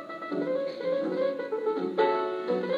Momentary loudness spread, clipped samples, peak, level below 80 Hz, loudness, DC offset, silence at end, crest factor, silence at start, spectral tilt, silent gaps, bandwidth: 5 LU; under 0.1%; -12 dBFS; -90 dBFS; -29 LUFS; under 0.1%; 0 s; 16 dB; 0 s; -7 dB/octave; none; 7.4 kHz